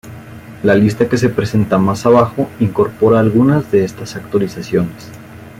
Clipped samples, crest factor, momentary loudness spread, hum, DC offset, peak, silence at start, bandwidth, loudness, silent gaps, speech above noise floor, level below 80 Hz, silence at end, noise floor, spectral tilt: under 0.1%; 12 dB; 22 LU; none; under 0.1%; -2 dBFS; 0.05 s; 16 kHz; -14 LUFS; none; 20 dB; -46 dBFS; 0.1 s; -33 dBFS; -7.5 dB/octave